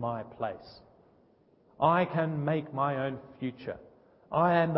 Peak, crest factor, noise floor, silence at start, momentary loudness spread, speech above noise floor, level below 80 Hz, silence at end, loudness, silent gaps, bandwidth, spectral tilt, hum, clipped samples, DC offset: -10 dBFS; 20 dB; -64 dBFS; 0 s; 15 LU; 34 dB; -66 dBFS; 0 s; -31 LUFS; none; 5.6 kHz; -6 dB/octave; none; under 0.1%; under 0.1%